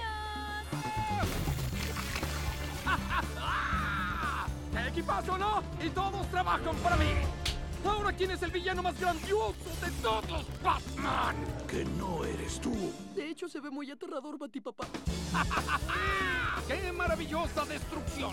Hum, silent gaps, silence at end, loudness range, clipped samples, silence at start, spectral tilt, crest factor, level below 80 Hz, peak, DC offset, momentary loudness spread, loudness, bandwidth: none; none; 0 s; 4 LU; under 0.1%; 0 s; -5 dB/octave; 18 dB; -42 dBFS; -16 dBFS; under 0.1%; 8 LU; -34 LUFS; 17.5 kHz